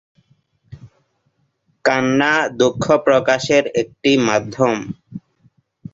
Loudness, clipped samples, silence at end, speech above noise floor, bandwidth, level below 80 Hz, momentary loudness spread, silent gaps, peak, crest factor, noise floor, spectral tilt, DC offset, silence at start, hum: -16 LUFS; under 0.1%; 0.75 s; 50 dB; 7.8 kHz; -54 dBFS; 13 LU; none; -2 dBFS; 18 dB; -66 dBFS; -4.5 dB/octave; under 0.1%; 0.7 s; none